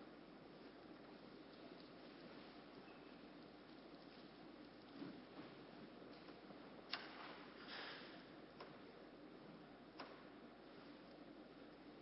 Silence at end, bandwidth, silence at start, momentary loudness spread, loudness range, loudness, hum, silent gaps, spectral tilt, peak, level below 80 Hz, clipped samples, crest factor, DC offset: 0 s; 5.6 kHz; 0 s; 8 LU; 5 LU; -58 LUFS; none; none; -2.5 dB/octave; -26 dBFS; -82 dBFS; under 0.1%; 32 dB; under 0.1%